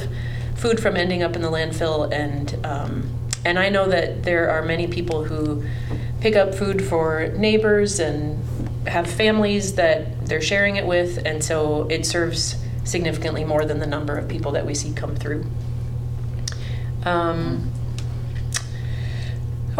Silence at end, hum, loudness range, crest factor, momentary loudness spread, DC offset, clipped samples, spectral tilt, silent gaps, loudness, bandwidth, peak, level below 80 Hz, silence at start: 0 s; none; 5 LU; 18 dB; 10 LU; under 0.1%; under 0.1%; -5 dB/octave; none; -22 LUFS; 14.5 kHz; -4 dBFS; -34 dBFS; 0 s